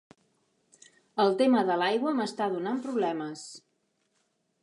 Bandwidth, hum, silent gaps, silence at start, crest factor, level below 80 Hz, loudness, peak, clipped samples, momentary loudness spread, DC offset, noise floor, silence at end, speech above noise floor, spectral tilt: 11 kHz; none; none; 1.15 s; 18 dB; -84 dBFS; -28 LUFS; -12 dBFS; under 0.1%; 14 LU; under 0.1%; -75 dBFS; 1.05 s; 48 dB; -5 dB/octave